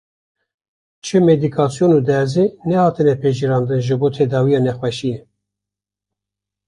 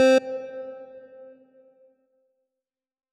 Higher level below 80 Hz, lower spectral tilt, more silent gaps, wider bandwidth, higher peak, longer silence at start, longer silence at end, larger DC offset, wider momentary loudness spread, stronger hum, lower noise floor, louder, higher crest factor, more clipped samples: first, -54 dBFS vs -82 dBFS; first, -7.5 dB/octave vs -3 dB/octave; neither; about the same, 11 kHz vs 11.5 kHz; first, -2 dBFS vs -10 dBFS; first, 1.05 s vs 0 s; second, 1.5 s vs 2.15 s; neither; second, 8 LU vs 27 LU; first, 50 Hz at -45 dBFS vs none; about the same, -86 dBFS vs -88 dBFS; first, -16 LUFS vs -26 LUFS; about the same, 16 dB vs 16 dB; neither